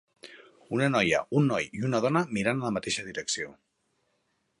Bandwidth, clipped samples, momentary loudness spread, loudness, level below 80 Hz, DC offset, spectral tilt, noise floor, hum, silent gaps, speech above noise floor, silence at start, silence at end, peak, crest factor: 11.5 kHz; under 0.1%; 7 LU; -28 LUFS; -62 dBFS; under 0.1%; -5 dB/octave; -75 dBFS; none; none; 47 dB; 0.25 s; 1.1 s; -10 dBFS; 20 dB